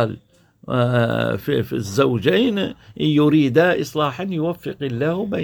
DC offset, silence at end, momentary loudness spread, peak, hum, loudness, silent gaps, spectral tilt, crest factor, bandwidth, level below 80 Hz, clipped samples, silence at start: under 0.1%; 0 s; 9 LU; -2 dBFS; none; -20 LUFS; none; -6.5 dB/octave; 16 dB; 19 kHz; -54 dBFS; under 0.1%; 0 s